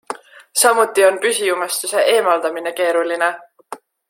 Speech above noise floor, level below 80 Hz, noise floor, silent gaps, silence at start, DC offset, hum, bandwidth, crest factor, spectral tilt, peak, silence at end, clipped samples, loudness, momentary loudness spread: 21 dB; -74 dBFS; -37 dBFS; none; 0.1 s; under 0.1%; none; 16.5 kHz; 18 dB; -0.5 dB/octave; 0 dBFS; 0.35 s; under 0.1%; -16 LUFS; 20 LU